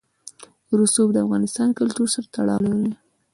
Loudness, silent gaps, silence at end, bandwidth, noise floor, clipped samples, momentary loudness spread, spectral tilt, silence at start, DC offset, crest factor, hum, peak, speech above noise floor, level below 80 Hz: -21 LUFS; none; 0.4 s; 11.5 kHz; -45 dBFS; under 0.1%; 13 LU; -5 dB/octave; 0.7 s; under 0.1%; 16 dB; none; -6 dBFS; 25 dB; -60 dBFS